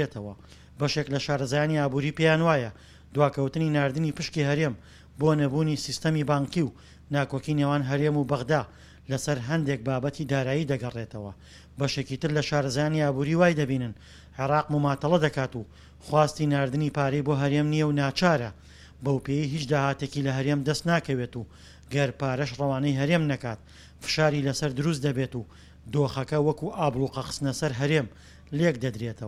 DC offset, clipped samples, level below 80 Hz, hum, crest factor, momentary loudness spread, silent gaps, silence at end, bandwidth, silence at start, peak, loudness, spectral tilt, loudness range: under 0.1%; under 0.1%; -52 dBFS; none; 20 dB; 10 LU; none; 0 s; 13 kHz; 0 s; -6 dBFS; -27 LUFS; -6 dB/octave; 3 LU